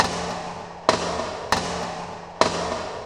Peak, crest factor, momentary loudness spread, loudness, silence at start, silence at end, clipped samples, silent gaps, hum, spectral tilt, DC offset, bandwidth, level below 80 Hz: 0 dBFS; 26 dB; 10 LU; -25 LUFS; 0 s; 0 s; under 0.1%; none; none; -3.5 dB/octave; under 0.1%; 16 kHz; -48 dBFS